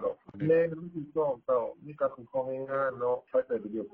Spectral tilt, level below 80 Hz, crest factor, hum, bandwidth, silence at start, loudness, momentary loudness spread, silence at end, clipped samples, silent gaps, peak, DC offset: -10.5 dB/octave; -70 dBFS; 16 dB; none; 3.8 kHz; 0 s; -31 LUFS; 9 LU; 0.05 s; under 0.1%; none; -14 dBFS; under 0.1%